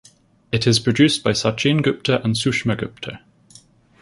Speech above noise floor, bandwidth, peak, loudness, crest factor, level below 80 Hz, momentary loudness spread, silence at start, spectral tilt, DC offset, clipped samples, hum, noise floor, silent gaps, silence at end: 31 dB; 11.5 kHz; -2 dBFS; -19 LUFS; 18 dB; -50 dBFS; 11 LU; 0.5 s; -5 dB/octave; under 0.1%; under 0.1%; none; -50 dBFS; none; 0.85 s